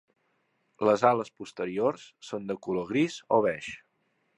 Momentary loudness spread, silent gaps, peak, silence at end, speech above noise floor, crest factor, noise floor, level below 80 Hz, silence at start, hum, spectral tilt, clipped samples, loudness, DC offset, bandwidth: 16 LU; none; -6 dBFS; 0.6 s; 46 dB; 22 dB; -74 dBFS; -70 dBFS; 0.8 s; none; -6 dB/octave; under 0.1%; -28 LUFS; under 0.1%; 11 kHz